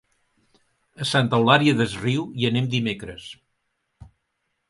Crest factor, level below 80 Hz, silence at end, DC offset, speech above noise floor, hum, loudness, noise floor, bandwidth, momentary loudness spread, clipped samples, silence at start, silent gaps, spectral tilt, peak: 22 dB; -56 dBFS; 0.65 s; under 0.1%; 54 dB; none; -21 LUFS; -76 dBFS; 11.5 kHz; 18 LU; under 0.1%; 1 s; none; -5.5 dB/octave; -2 dBFS